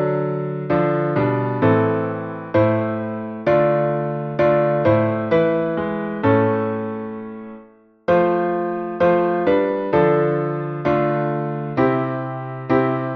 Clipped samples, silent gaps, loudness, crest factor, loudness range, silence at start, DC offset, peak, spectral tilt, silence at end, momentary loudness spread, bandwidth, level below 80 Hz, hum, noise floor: under 0.1%; none; -20 LUFS; 16 dB; 2 LU; 0 s; under 0.1%; -4 dBFS; -10 dB/octave; 0 s; 9 LU; 6 kHz; -52 dBFS; none; -48 dBFS